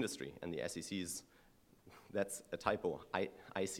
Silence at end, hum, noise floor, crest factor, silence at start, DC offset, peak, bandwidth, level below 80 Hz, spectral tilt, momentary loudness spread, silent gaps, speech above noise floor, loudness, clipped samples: 0 s; none; -67 dBFS; 26 dB; 0 s; under 0.1%; -18 dBFS; 16.5 kHz; -70 dBFS; -3.5 dB/octave; 8 LU; none; 25 dB; -42 LUFS; under 0.1%